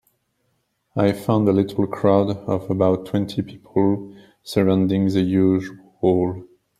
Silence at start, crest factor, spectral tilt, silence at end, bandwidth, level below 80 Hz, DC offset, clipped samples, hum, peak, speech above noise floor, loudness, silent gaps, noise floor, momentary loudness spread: 0.95 s; 18 dB; -8 dB/octave; 0.35 s; 14 kHz; -56 dBFS; under 0.1%; under 0.1%; none; -2 dBFS; 50 dB; -20 LUFS; none; -70 dBFS; 10 LU